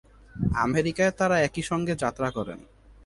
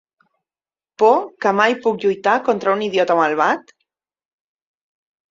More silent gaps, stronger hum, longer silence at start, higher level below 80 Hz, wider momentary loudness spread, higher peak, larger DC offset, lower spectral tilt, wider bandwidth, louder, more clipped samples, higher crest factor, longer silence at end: neither; neither; second, 0.35 s vs 1 s; first, -46 dBFS vs -68 dBFS; first, 13 LU vs 4 LU; second, -10 dBFS vs -2 dBFS; neither; about the same, -5.5 dB/octave vs -5 dB/octave; first, 11.5 kHz vs 7.6 kHz; second, -26 LUFS vs -17 LUFS; neither; about the same, 18 dB vs 18 dB; second, 0.45 s vs 1.7 s